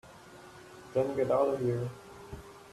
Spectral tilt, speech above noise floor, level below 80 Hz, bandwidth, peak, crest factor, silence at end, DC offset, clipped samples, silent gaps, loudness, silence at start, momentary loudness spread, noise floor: -7.5 dB/octave; 23 dB; -60 dBFS; 13.5 kHz; -16 dBFS; 18 dB; 0 s; under 0.1%; under 0.1%; none; -31 LUFS; 0.05 s; 23 LU; -52 dBFS